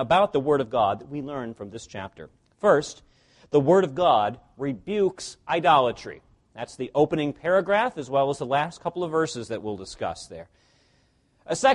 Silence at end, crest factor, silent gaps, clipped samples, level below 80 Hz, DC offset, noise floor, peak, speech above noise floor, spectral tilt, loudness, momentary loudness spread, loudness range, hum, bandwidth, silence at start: 0 s; 18 dB; none; under 0.1%; -58 dBFS; under 0.1%; -64 dBFS; -6 dBFS; 40 dB; -5 dB/octave; -24 LUFS; 18 LU; 5 LU; none; 11.5 kHz; 0 s